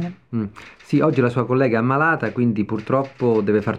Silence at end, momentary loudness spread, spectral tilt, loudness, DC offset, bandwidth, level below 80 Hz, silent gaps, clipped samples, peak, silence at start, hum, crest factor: 0 s; 10 LU; -9 dB/octave; -20 LUFS; 0.1%; 9.2 kHz; -58 dBFS; none; under 0.1%; -4 dBFS; 0 s; none; 16 dB